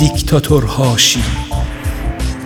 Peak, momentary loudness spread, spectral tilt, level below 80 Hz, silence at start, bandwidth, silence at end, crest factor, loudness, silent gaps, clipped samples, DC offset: 0 dBFS; 11 LU; -4 dB/octave; -22 dBFS; 0 s; 18.5 kHz; 0 s; 14 dB; -14 LUFS; none; under 0.1%; under 0.1%